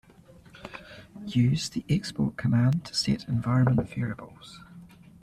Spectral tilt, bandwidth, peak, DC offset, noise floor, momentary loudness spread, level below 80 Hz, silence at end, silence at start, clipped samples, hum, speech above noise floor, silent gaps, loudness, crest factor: -6 dB/octave; 12.5 kHz; -12 dBFS; under 0.1%; -53 dBFS; 22 LU; -54 dBFS; 0.35 s; 0.55 s; under 0.1%; none; 27 dB; none; -27 LUFS; 16 dB